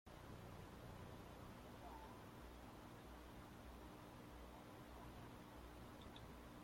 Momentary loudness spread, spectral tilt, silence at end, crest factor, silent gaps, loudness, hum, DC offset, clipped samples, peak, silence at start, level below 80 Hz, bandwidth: 2 LU; -5.5 dB/octave; 0 s; 14 dB; none; -59 LUFS; 60 Hz at -65 dBFS; under 0.1%; under 0.1%; -44 dBFS; 0.05 s; -66 dBFS; 16.5 kHz